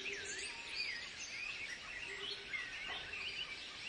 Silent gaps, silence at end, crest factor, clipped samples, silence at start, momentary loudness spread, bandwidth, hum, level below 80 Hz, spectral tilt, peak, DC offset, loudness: none; 0 s; 16 dB; under 0.1%; 0 s; 4 LU; 11.5 kHz; none; -70 dBFS; 0 dB/octave; -30 dBFS; under 0.1%; -43 LUFS